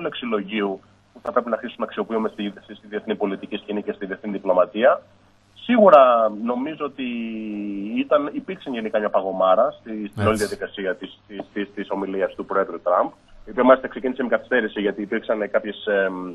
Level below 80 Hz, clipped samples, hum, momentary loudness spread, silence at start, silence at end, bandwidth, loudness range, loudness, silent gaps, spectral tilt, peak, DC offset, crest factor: -56 dBFS; under 0.1%; none; 14 LU; 0 s; 0 s; 12 kHz; 8 LU; -22 LUFS; none; -6 dB/octave; 0 dBFS; under 0.1%; 22 dB